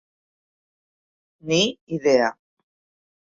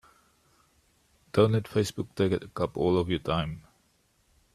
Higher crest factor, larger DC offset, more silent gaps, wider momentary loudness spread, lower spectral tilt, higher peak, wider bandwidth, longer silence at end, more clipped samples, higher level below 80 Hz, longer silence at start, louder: about the same, 22 dB vs 22 dB; neither; first, 1.81-1.87 s vs none; about the same, 7 LU vs 8 LU; second, -4 dB/octave vs -6.5 dB/octave; first, -4 dBFS vs -8 dBFS; second, 7.8 kHz vs 14 kHz; about the same, 1 s vs 0.95 s; neither; second, -66 dBFS vs -56 dBFS; about the same, 1.45 s vs 1.35 s; first, -21 LUFS vs -28 LUFS